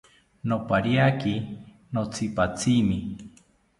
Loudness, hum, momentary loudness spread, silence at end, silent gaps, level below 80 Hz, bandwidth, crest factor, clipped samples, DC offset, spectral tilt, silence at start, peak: -25 LUFS; none; 16 LU; 0.5 s; none; -50 dBFS; 11.5 kHz; 20 dB; under 0.1%; under 0.1%; -6 dB/octave; 0.45 s; -6 dBFS